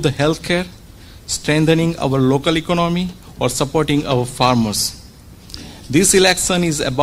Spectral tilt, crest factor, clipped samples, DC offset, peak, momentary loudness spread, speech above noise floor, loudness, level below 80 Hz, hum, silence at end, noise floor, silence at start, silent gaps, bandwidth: -4 dB/octave; 18 dB; under 0.1%; under 0.1%; 0 dBFS; 14 LU; 24 dB; -16 LUFS; -38 dBFS; none; 0 s; -40 dBFS; 0 s; none; 16 kHz